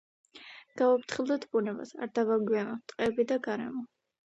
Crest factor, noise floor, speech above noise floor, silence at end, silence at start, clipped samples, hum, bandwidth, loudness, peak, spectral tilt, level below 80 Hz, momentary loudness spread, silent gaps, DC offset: 18 dB; -52 dBFS; 22 dB; 0.45 s; 0.35 s; under 0.1%; none; 8.2 kHz; -31 LUFS; -14 dBFS; -5.5 dB/octave; -72 dBFS; 20 LU; none; under 0.1%